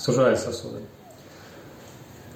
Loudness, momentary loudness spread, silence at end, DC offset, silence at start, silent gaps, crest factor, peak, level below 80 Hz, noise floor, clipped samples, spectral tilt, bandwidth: -24 LUFS; 25 LU; 0 s; under 0.1%; 0 s; none; 18 dB; -8 dBFS; -62 dBFS; -46 dBFS; under 0.1%; -5 dB/octave; 16.5 kHz